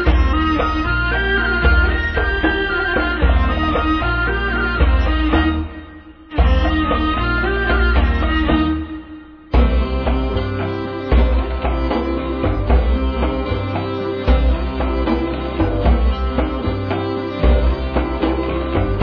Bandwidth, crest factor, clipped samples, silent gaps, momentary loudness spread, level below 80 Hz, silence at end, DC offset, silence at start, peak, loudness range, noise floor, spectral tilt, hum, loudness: 5.4 kHz; 14 dB; under 0.1%; none; 6 LU; -20 dBFS; 0 s; under 0.1%; 0 s; -2 dBFS; 3 LU; -38 dBFS; -8.5 dB/octave; none; -18 LUFS